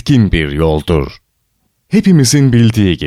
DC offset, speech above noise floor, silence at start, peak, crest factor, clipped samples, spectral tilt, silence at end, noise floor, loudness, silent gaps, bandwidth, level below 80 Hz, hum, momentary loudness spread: under 0.1%; 52 dB; 0.05 s; 0 dBFS; 10 dB; under 0.1%; -6 dB/octave; 0 s; -62 dBFS; -11 LUFS; none; 15 kHz; -26 dBFS; none; 7 LU